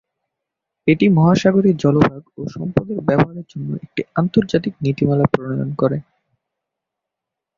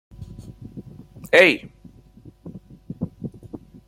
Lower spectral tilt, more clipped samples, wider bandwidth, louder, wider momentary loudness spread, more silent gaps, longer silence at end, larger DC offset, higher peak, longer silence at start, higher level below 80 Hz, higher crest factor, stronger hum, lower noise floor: first, -8 dB/octave vs -5 dB/octave; neither; second, 7.4 kHz vs 16.5 kHz; about the same, -18 LUFS vs -18 LUFS; second, 14 LU vs 27 LU; neither; first, 1.55 s vs 0.3 s; neither; about the same, -2 dBFS vs 0 dBFS; first, 0.85 s vs 0.2 s; about the same, -48 dBFS vs -52 dBFS; second, 16 dB vs 24 dB; neither; first, -83 dBFS vs -48 dBFS